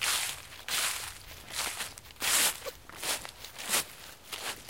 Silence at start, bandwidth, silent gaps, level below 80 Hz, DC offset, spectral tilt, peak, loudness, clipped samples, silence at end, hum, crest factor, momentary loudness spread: 0 s; 17 kHz; none; -60 dBFS; 0.1%; 1 dB/octave; -14 dBFS; -32 LUFS; under 0.1%; 0 s; none; 22 dB; 16 LU